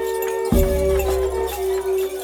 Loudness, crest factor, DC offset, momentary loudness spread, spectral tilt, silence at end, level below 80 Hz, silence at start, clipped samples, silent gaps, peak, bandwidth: -21 LUFS; 18 dB; under 0.1%; 4 LU; -6 dB/octave; 0 s; -28 dBFS; 0 s; under 0.1%; none; -2 dBFS; 19.5 kHz